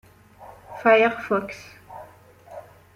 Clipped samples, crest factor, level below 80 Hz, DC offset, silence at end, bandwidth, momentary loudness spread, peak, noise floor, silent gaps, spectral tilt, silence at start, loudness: under 0.1%; 22 dB; -62 dBFS; under 0.1%; 0.35 s; 15 kHz; 26 LU; -4 dBFS; -49 dBFS; none; -5.5 dB/octave; 0.4 s; -20 LUFS